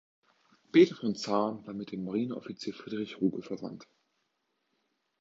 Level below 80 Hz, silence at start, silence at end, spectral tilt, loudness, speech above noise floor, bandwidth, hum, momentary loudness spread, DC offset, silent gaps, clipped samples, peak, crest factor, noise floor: -76 dBFS; 0.75 s; 1.35 s; -6 dB/octave; -31 LUFS; 49 dB; 7.8 kHz; none; 16 LU; under 0.1%; none; under 0.1%; -10 dBFS; 22 dB; -80 dBFS